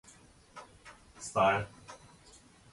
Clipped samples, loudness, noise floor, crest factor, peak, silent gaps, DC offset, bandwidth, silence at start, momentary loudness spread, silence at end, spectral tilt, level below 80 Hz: under 0.1%; -31 LUFS; -59 dBFS; 22 dB; -14 dBFS; none; under 0.1%; 11.5 kHz; 0.55 s; 25 LU; 0.75 s; -4 dB/octave; -64 dBFS